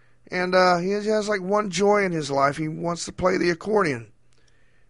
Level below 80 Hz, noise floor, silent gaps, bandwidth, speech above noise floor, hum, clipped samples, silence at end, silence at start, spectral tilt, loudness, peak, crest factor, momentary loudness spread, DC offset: -54 dBFS; -61 dBFS; none; 11.5 kHz; 39 dB; none; under 0.1%; 0.85 s; 0.3 s; -5 dB/octave; -23 LUFS; -6 dBFS; 16 dB; 9 LU; 0.2%